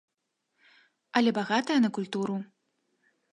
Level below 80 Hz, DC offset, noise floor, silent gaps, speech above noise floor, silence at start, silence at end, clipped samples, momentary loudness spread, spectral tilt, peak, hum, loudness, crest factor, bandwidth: -80 dBFS; under 0.1%; -80 dBFS; none; 54 dB; 1.15 s; 0.85 s; under 0.1%; 10 LU; -5.5 dB/octave; -8 dBFS; none; -28 LUFS; 24 dB; 10.5 kHz